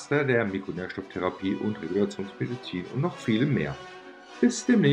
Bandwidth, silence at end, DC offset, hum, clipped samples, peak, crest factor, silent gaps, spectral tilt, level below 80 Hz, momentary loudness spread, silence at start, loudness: 10.5 kHz; 0 s; under 0.1%; none; under 0.1%; -10 dBFS; 18 dB; none; -6 dB/octave; -60 dBFS; 11 LU; 0 s; -28 LUFS